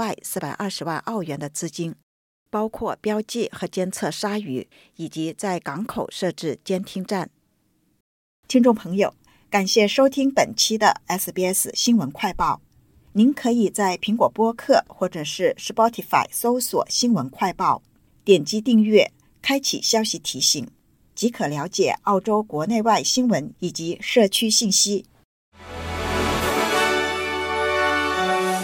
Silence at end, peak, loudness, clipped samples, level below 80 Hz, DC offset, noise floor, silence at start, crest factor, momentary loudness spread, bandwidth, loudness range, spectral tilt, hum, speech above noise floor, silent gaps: 0 s; -4 dBFS; -21 LUFS; under 0.1%; -50 dBFS; under 0.1%; -66 dBFS; 0 s; 18 dB; 11 LU; 17 kHz; 8 LU; -3.5 dB/octave; none; 45 dB; 2.03-2.46 s, 8.00-8.43 s, 25.25-25.52 s